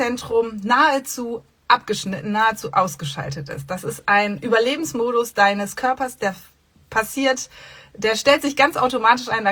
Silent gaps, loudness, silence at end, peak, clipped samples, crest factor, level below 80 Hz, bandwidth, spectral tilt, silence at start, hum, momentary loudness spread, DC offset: none; -20 LUFS; 0 s; -2 dBFS; under 0.1%; 20 dB; -56 dBFS; over 20 kHz; -3.5 dB/octave; 0 s; none; 12 LU; under 0.1%